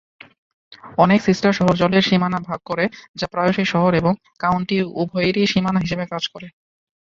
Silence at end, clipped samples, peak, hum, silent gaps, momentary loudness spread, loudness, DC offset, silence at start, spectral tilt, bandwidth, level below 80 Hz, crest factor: 0.5 s; under 0.1%; -2 dBFS; none; 3.09-3.14 s; 10 LU; -19 LUFS; under 0.1%; 0.85 s; -6.5 dB/octave; 7.4 kHz; -50 dBFS; 18 dB